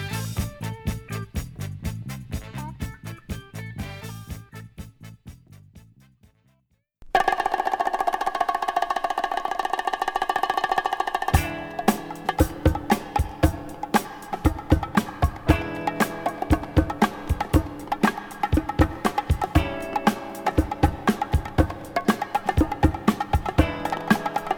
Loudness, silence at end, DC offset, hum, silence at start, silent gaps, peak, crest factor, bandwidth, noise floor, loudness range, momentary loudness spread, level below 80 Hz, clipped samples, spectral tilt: -25 LUFS; 0 s; under 0.1%; none; 0 s; none; -2 dBFS; 22 dB; over 20 kHz; -68 dBFS; 12 LU; 13 LU; -32 dBFS; under 0.1%; -6 dB/octave